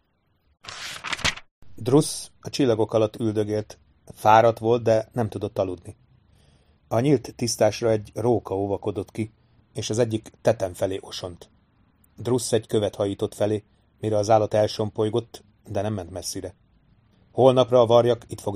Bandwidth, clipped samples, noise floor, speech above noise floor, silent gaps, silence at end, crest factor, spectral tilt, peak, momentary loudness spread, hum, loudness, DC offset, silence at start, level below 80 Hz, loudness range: 15.5 kHz; under 0.1%; -67 dBFS; 45 dB; 1.51-1.62 s; 0 s; 22 dB; -5.5 dB/octave; -2 dBFS; 16 LU; none; -23 LUFS; under 0.1%; 0.65 s; -56 dBFS; 5 LU